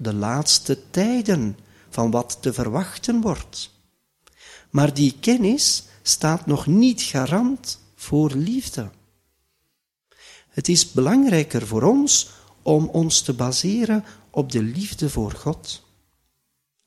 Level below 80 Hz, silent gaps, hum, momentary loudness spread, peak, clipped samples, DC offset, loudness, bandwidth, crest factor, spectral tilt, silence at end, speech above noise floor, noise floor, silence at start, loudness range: -48 dBFS; none; none; 13 LU; -2 dBFS; under 0.1%; under 0.1%; -20 LUFS; 15 kHz; 18 dB; -4.5 dB/octave; 1.1 s; 54 dB; -74 dBFS; 0 s; 6 LU